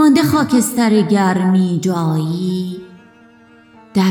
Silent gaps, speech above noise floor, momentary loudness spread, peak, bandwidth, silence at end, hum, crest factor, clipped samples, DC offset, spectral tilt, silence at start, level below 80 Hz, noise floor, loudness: none; 31 dB; 9 LU; -2 dBFS; 18.5 kHz; 0 s; none; 14 dB; under 0.1%; under 0.1%; -6 dB/octave; 0 s; -56 dBFS; -46 dBFS; -15 LUFS